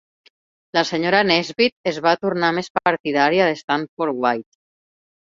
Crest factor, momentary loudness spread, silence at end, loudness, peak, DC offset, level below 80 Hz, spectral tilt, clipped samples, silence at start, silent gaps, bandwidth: 20 dB; 7 LU; 0.95 s; -19 LUFS; -2 dBFS; under 0.1%; -64 dBFS; -4.5 dB/octave; under 0.1%; 0.75 s; 1.72-1.84 s, 2.70-2.75 s, 3.00-3.04 s, 3.64-3.68 s, 3.89-3.97 s; 7.6 kHz